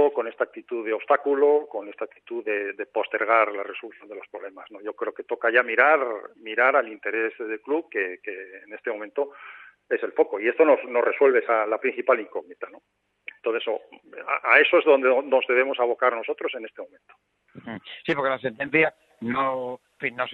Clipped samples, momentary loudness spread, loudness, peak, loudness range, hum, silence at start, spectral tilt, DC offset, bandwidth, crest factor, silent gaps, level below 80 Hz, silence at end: under 0.1%; 19 LU; -23 LUFS; -2 dBFS; 6 LU; none; 0 s; -7 dB/octave; under 0.1%; 4.8 kHz; 22 dB; none; -76 dBFS; 0 s